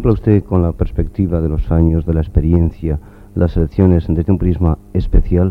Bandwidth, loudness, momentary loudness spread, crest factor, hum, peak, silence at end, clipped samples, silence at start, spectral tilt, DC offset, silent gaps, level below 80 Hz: 4.4 kHz; -16 LUFS; 7 LU; 14 dB; none; 0 dBFS; 0 s; under 0.1%; 0 s; -11.5 dB/octave; under 0.1%; none; -20 dBFS